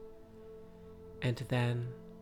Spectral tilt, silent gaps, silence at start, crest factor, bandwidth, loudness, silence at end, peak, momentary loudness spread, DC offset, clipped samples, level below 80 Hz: -7 dB/octave; none; 0 s; 18 dB; 12.5 kHz; -36 LUFS; 0 s; -20 dBFS; 21 LU; under 0.1%; under 0.1%; -62 dBFS